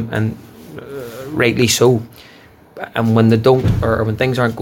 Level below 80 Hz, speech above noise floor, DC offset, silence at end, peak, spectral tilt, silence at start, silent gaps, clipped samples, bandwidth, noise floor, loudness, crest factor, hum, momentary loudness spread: -38 dBFS; 27 dB; under 0.1%; 0 s; 0 dBFS; -5.5 dB/octave; 0 s; none; under 0.1%; 17 kHz; -42 dBFS; -15 LUFS; 16 dB; none; 20 LU